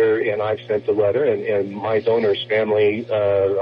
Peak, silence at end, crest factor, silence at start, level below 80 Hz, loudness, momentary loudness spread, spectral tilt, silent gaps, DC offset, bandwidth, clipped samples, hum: -8 dBFS; 0 s; 10 dB; 0 s; -54 dBFS; -20 LUFS; 4 LU; -8 dB/octave; none; under 0.1%; 5.4 kHz; under 0.1%; none